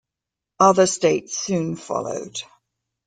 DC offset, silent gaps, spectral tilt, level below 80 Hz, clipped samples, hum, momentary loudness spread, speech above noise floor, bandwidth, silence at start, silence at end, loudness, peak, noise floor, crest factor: under 0.1%; none; -4 dB/octave; -64 dBFS; under 0.1%; none; 14 LU; 66 dB; 9.6 kHz; 0.6 s; 0.6 s; -20 LUFS; -2 dBFS; -86 dBFS; 20 dB